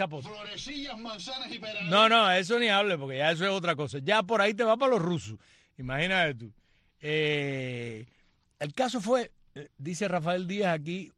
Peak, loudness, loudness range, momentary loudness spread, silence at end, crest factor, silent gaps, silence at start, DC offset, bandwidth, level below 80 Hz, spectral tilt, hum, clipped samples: -10 dBFS; -28 LUFS; 7 LU; 16 LU; 0.1 s; 20 dB; none; 0 s; under 0.1%; 12 kHz; -62 dBFS; -4.5 dB/octave; none; under 0.1%